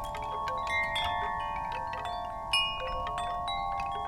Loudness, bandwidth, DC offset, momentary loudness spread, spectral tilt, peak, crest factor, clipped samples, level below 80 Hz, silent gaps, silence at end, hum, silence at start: -32 LUFS; 16.5 kHz; under 0.1%; 8 LU; -2.5 dB/octave; -16 dBFS; 18 dB; under 0.1%; -48 dBFS; none; 0 s; none; 0 s